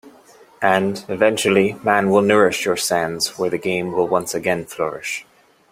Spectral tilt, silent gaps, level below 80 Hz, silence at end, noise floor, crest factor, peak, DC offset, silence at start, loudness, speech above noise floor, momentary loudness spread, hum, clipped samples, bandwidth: -4 dB/octave; none; -58 dBFS; 0.5 s; -48 dBFS; 18 dB; 0 dBFS; under 0.1%; 0.05 s; -19 LUFS; 30 dB; 9 LU; none; under 0.1%; 16 kHz